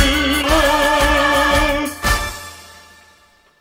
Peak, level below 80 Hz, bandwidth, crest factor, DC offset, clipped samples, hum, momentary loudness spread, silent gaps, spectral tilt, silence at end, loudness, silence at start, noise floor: 0 dBFS; -26 dBFS; 16.5 kHz; 16 dB; under 0.1%; under 0.1%; none; 11 LU; none; -3.5 dB/octave; 0.95 s; -15 LUFS; 0 s; -52 dBFS